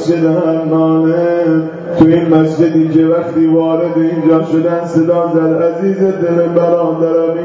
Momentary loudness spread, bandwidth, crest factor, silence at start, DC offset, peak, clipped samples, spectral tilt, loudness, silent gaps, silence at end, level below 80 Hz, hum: 3 LU; 7.6 kHz; 10 dB; 0 s; under 0.1%; 0 dBFS; under 0.1%; -9 dB/octave; -12 LUFS; none; 0 s; -50 dBFS; none